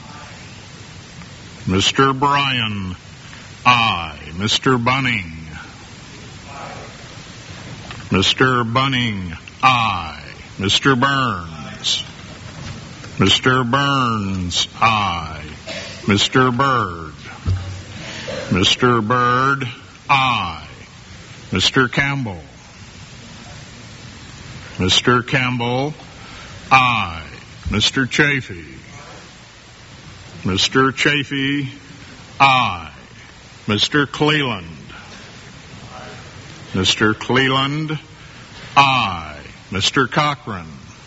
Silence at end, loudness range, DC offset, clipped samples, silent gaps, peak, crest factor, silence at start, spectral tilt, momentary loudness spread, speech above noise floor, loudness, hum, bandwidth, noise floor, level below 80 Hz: 0 s; 4 LU; under 0.1%; under 0.1%; none; 0 dBFS; 20 dB; 0 s; -2.5 dB/octave; 23 LU; 25 dB; -17 LUFS; none; 8 kHz; -42 dBFS; -44 dBFS